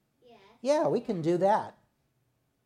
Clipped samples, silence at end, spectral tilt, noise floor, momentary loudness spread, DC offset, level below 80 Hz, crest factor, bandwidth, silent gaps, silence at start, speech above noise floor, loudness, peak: under 0.1%; 0.95 s; -6.5 dB/octave; -74 dBFS; 8 LU; under 0.1%; -76 dBFS; 16 dB; 11 kHz; none; 0.65 s; 47 dB; -28 LUFS; -14 dBFS